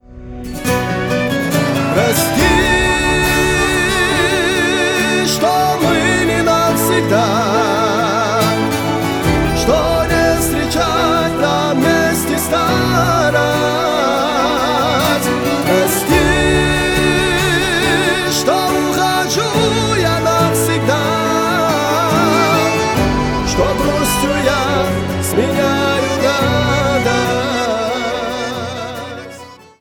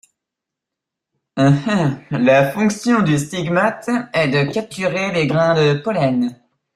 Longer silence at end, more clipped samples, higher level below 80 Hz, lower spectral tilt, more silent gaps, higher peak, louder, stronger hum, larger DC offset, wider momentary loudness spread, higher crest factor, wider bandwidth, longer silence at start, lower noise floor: second, 0.25 s vs 0.4 s; neither; first, -30 dBFS vs -54 dBFS; second, -4.5 dB/octave vs -6 dB/octave; neither; about the same, -2 dBFS vs -2 dBFS; first, -14 LUFS vs -17 LUFS; neither; neither; second, 4 LU vs 7 LU; about the same, 12 dB vs 16 dB; first, 19.5 kHz vs 14 kHz; second, 0.1 s vs 1.35 s; second, -36 dBFS vs -83 dBFS